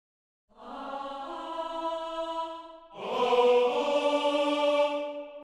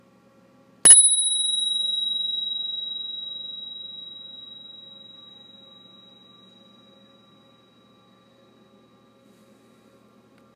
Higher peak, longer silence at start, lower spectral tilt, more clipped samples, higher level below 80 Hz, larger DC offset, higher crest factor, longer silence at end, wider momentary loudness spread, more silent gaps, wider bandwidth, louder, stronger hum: second, -12 dBFS vs 0 dBFS; second, 0.6 s vs 0.85 s; first, -3 dB/octave vs 2.5 dB/octave; neither; about the same, -66 dBFS vs -66 dBFS; neither; second, 18 dB vs 26 dB; second, 0 s vs 5.6 s; second, 16 LU vs 29 LU; neither; second, 10.5 kHz vs 15.5 kHz; second, -28 LUFS vs -17 LUFS; second, none vs 60 Hz at -65 dBFS